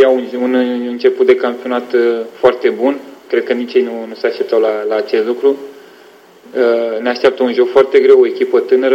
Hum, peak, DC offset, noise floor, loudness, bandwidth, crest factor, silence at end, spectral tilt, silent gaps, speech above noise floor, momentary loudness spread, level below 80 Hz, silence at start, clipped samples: none; 0 dBFS; under 0.1%; -42 dBFS; -13 LUFS; 7.4 kHz; 14 dB; 0 s; -5.5 dB/octave; none; 29 dB; 9 LU; -60 dBFS; 0 s; under 0.1%